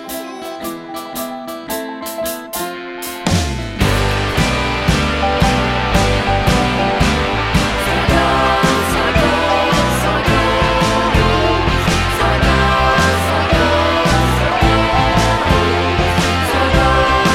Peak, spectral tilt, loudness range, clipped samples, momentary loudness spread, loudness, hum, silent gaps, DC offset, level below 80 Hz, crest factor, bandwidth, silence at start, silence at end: 0 dBFS; -5 dB/octave; 6 LU; under 0.1%; 12 LU; -14 LUFS; none; none; 0.4%; -24 dBFS; 14 dB; 16.5 kHz; 0 s; 0 s